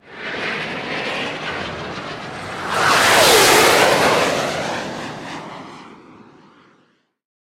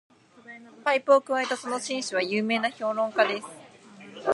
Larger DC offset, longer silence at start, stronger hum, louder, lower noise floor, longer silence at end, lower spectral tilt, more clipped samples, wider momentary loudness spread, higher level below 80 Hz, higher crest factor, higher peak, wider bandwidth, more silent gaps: neither; second, 0.05 s vs 0.45 s; neither; first, -16 LUFS vs -26 LUFS; first, -60 dBFS vs -49 dBFS; first, 1.45 s vs 0 s; about the same, -2 dB/octave vs -3 dB/octave; neither; second, 20 LU vs 23 LU; first, -50 dBFS vs -82 dBFS; about the same, 18 dB vs 20 dB; first, 0 dBFS vs -6 dBFS; first, 16.5 kHz vs 11.5 kHz; neither